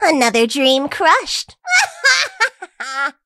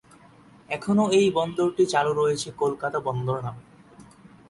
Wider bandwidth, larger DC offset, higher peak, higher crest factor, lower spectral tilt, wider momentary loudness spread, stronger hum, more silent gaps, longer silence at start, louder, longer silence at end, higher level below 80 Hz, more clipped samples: first, 15.5 kHz vs 11.5 kHz; neither; first, 0 dBFS vs -8 dBFS; about the same, 16 dB vs 16 dB; second, -1 dB/octave vs -5.5 dB/octave; about the same, 9 LU vs 11 LU; neither; neither; second, 0 s vs 0.7 s; first, -15 LUFS vs -24 LUFS; second, 0.15 s vs 0.45 s; about the same, -58 dBFS vs -60 dBFS; neither